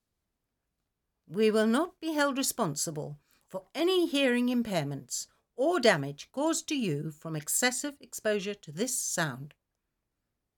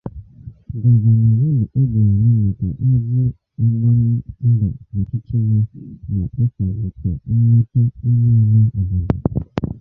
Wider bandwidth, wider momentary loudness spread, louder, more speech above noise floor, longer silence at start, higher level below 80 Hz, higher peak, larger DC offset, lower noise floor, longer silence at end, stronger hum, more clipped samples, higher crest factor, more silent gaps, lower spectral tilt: first, 19 kHz vs 2.1 kHz; first, 13 LU vs 10 LU; second, -30 LUFS vs -17 LUFS; first, 54 dB vs 22 dB; first, 1.3 s vs 0.05 s; second, -72 dBFS vs -34 dBFS; second, -10 dBFS vs -2 dBFS; neither; first, -84 dBFS vs -38 dBFS; first, 1.1 s vs 0 s; neither; neither; first, 22 dB vs 14 dB; neither; second, -3.5 dB/octave vs -12.5 dB/octave